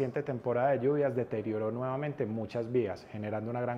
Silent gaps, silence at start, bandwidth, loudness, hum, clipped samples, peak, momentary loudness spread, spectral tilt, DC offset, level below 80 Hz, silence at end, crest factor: none; 0 s; 7.4 kHz; -33 LUFS; none; under 0.1%; -18 dBFS; 8 LU; -9 dB/octave; under 0.1%; -70 dBFS; 0 s; 14 dB